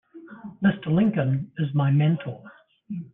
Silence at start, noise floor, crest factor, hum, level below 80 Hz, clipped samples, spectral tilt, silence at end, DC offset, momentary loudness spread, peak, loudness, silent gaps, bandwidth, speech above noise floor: 0.15 s; -42 dBFS; 16 dB; none; -60 dBFS; under 0.1%; -11.5 dB/octave; 0.05 s; under 0.1%; 19 LU; -10 dBFS; -23 LUFS; none; 3.8 kHz; 20 dB